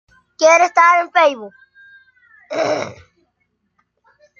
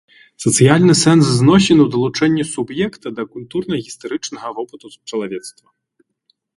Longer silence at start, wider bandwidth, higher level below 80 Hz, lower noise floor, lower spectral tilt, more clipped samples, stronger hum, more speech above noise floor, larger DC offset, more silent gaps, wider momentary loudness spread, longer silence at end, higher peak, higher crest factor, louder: about the same, 0.4 s vs 0.4 s; second, 7.4 kHz vs 11.5 kHz; second, -68 dBFS vs -50 dBFS; first, -69 dBFS vs -64 dBFS; second, -2 dB/octave vs -5 dB/octave; neither; neither; first, 54 dB vs 49 dB; neither; neither; about the same, 17 LU vs 17 LU; first, 1.45 s vs 1.1 s; about the same, 0 dBFS vs 0 dBFS; about the same, 18 dB vs 16 dB; about the same, -14 LUFS vs -15 LUFS